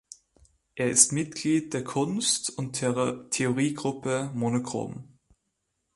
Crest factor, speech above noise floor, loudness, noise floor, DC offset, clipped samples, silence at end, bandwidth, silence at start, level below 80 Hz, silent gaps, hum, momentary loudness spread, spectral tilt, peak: 24 dB; 52 dB; -26 LUFS; -79 dBFS; under 0.1%; under 0.1%; 0.9 s; 11.5 kHz; 0.75 s; -64 dBFS; none; none; 12 LU; -3.5 dB/octave; -4 dBFS